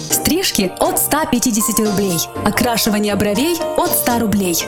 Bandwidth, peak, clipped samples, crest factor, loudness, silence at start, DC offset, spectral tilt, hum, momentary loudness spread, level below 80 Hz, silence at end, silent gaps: 19 kHz; 0 dBFS; under 0.1%; 16 dB; -16 LUFS; 0 s; under 0.1%; -3.5 dB/octave; none; 3 LU; -40 dBFS; 0 s; none